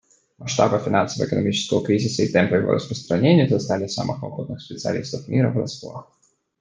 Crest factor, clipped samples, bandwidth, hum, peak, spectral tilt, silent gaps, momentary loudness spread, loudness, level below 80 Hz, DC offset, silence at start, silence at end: 20 dB; under 0.1%; 9.8 kHz; none; -2 dBFS; -6 dB/octave; none; 14 LU; -21 LUFS; -58 dBFS; under 0.1%; 0.4 s; 0.55 s